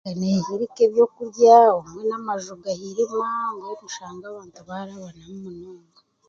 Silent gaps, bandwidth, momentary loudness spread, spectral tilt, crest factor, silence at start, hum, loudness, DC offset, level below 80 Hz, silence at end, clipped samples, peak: none; 7.4 kHz; 25 LU; -6 dB/octave; 20 dB; 0.05 s; none; -20 LUFS; under 0.1%; -66 dBFS; 0.55 s; under 0.1%; -2 dBFS